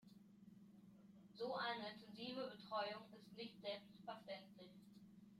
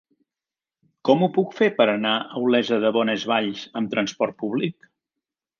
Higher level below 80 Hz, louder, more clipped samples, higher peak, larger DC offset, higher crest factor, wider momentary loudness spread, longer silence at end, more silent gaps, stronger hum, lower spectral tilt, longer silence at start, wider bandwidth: second, -90 dBFS vs -72 dBFS; second, -50 LUFS vs -22 LUFS; neither; second, -34 dBFS vs -4 dBFS; neither; about the same, 18 dB vs 20 dB; first, 20 LU vs 8 LU; second, 0 s vs 0.9 s; neither; neither; about the same, -5.5 dB/octave vs -5.5 dB/octave; second, 0 s vs 1.05 s; first, 16 kHz vs 7.2 kHz